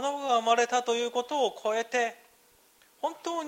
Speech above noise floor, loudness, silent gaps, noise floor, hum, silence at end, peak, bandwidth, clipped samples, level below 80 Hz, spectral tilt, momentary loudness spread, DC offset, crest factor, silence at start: 34 dB; -28 LUFS; none; -62 dBFS; none; 0 s; -12 dBFS; 16 kHz; under 0.1%; -80 dBFS; -1 dB/octave; 9 LU; under 0.1%; 18 dB; 0 s